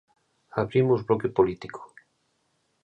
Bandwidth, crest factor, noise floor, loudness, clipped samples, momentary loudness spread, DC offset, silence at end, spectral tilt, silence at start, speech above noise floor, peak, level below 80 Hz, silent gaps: 8.4 kHz; 20 dB; -72 dBFS; -25 LUFS; under 0.1%; 17 LU; under 0.1%; 1 s; -9 dB/octave; 0.55 s; 48 dB; -8 dBFS; -58 dBFS; none